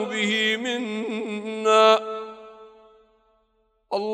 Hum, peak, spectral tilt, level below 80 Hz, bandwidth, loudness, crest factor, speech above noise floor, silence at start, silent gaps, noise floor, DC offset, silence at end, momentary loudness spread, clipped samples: none; -4 dBFS; -3.5 dB/octave; -74 dBFS; 13.5 kHz; -22 LUFS; 22 dB; 46 dB; 0 s; none; -68 dBFS; under 0.1%; 0 s; 18 LU; under 0.1%